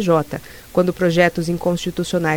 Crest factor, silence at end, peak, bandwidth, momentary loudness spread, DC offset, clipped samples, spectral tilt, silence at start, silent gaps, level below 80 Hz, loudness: 18 dB; 0 s; -2 dBFS; 19.5 kHz; 8 LU; under 0.1%; under 0.1%; -6 dB/octave; 0 s; none; -46 dBFS; -19 LUFS